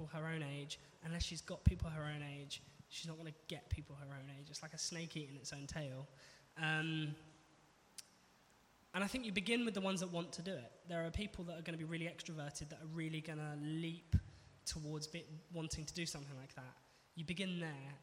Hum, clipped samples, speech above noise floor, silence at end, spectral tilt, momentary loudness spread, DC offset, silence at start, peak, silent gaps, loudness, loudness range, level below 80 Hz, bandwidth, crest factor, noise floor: none; under 0.1%; 26 dB; 0 s; -4.5 dB/octave; 14 LU; under 0.1%; 0 s; -16 dBFS; none; -44 LUFS; 5 LU; -56 dBFS; 16 kHz; 28 dB; -70 dBFS